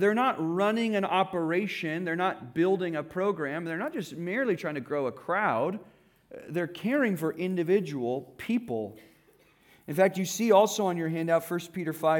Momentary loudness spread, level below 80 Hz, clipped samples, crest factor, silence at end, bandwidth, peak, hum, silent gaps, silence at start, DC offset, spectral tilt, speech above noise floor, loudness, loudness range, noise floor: 9 LU; -74 dBFS; under 0.1%; 18 dB; 0 s; 18 kHz; -10 dBFS; none; none; 0 s; under 0.1%; -5.5 dB/octave; 34 dB; -29 LUFS; 3 LU; -62 dBFS